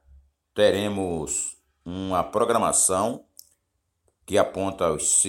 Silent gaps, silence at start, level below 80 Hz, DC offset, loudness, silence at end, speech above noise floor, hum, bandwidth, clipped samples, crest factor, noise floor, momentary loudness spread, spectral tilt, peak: none; 0.55 s; -54 dBFS; under 0.1%; -23 LUFS; 0 s; 52 dB; none; 17 kHz; under 0.1%; 20 dB; -76 dBFS; 15 LU; -3 dB/octave; -6 dBFS